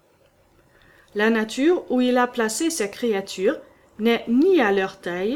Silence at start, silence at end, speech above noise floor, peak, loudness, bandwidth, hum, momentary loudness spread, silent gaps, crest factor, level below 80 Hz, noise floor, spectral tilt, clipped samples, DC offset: 1.15 s; 0 s; 38 dB; -6 dBFS; -21 LUFS; 17 kHz; none; 7 LU; none; 16 dB; -62 dBFS; -59 dBFS; -4 dB/octave; under 0.1%; under 0.1%